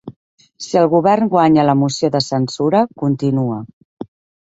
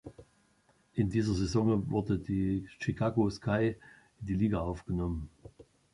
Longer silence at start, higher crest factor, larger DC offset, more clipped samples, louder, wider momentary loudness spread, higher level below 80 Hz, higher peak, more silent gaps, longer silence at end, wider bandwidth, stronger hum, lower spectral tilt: about the same, 0.05 s vs 0.05 s; about the same, 14 dB vs 16 dB; neither; neither; first, -15 LUFS vs -32 LUFS; first, 21 LU vs 11 LU; second, -56 dBFS vs -48 dBFS; first, -2 dBFS vs -16 dBFS; first, 0.16-0.38 s, 3.73-3.97 s vs none; first, 0.45 s vs 0.3 s; second, 8 kHz vs 11 kHz; neither; about the same, -6.5 dB/octave vs -7.5 dB/octave